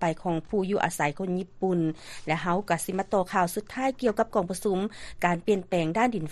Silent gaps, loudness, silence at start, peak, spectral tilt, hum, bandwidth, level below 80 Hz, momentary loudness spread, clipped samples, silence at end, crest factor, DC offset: none; -28 LUFS; 0 s; -8 dBFS; -5.5 dB/octave; none; 13 kHz; -54 dBFS; 5 LU; under 0.1%; 0 s; 18 dB; under 0.1%